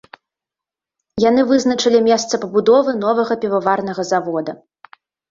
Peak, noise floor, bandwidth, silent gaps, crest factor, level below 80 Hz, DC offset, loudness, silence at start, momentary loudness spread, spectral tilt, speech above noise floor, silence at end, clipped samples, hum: -2 dBFS; -87 dBFS; 7.8 kHz; none; 16 dB; -58 dBFS; under 0.1%; -16 LUFS; 1.15 s; 8 LU; -4.5 dB/octave; 72 dB; 0.75 s; under 0.1%; none